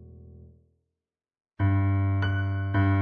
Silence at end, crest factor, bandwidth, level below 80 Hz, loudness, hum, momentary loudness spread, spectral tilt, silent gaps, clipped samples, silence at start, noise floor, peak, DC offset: 0 s; 14 dB; 4.7 kHz; -54 dBFS; -26 LUFS; none; 4 LU; -10 dB/octave; none; under 0.1%; 0 s; -89 dBFS; -14 dBFS; under 0.1%